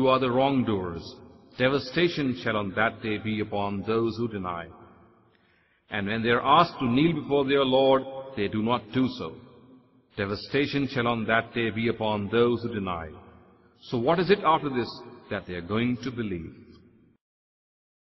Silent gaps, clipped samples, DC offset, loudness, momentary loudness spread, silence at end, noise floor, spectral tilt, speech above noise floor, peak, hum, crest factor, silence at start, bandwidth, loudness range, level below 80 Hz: none; under 0.1%; under 0.1%; -26 LUFS; 14 LU; 1.55 s; -65 dBFS; -7.5 dB/octave; 39 dB; -6 dBFS; none; 20 dB; 0 s; 6 kHz; 6 LU; -56 dBFS